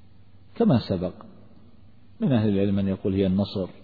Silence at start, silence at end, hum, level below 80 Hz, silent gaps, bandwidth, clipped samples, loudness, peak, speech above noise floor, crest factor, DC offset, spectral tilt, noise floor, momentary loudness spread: 0.55 s; 0.15 s; none; -54 dBFS; none; 4.9 kHz; under 0.1%; -24 LUFS; -8 dBFS; 31 dB; 16 dB; 0.3%; -10.5 dB/octave; -54 dBFS; 7 LU